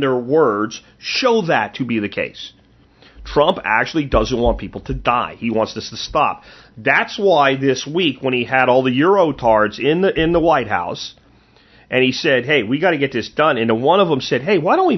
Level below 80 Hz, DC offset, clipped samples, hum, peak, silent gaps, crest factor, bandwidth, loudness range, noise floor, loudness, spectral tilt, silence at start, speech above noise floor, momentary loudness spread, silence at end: -38 dBFS; under 0.1%; under 0.1%; none; 0 dBFS; none; 18 dB; 6.2 kHz; 4 LU; -51 dBFS; -17 LUFS; -5.5 dB/octave; 0 s; 34 dB; 9 LU; 0 s